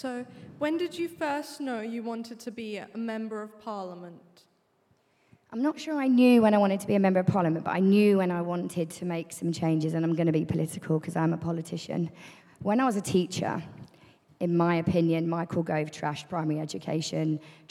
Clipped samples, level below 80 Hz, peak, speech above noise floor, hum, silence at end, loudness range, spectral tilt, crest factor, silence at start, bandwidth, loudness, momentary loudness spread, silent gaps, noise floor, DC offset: under 0.1%; -68 dBFS; -10 dBFS; 41 dB; none; 0.2 s; 13 LU; -6.5 dB/octave; 18 dB; 0 s; 14.5 kHz; -28 LUFS; 15 LU; none; -69 dBFS; under 0.1%